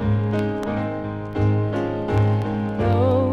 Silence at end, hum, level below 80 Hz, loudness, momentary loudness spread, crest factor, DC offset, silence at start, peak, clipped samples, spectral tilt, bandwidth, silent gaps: 0 s; none; -40 dBFS; -22 LUFS; 7 LU; 12 dB; under 0.1%; 0 s; -8 dBFS; under 0.1%; -9.5 dB/octave; 6.2 kHz; none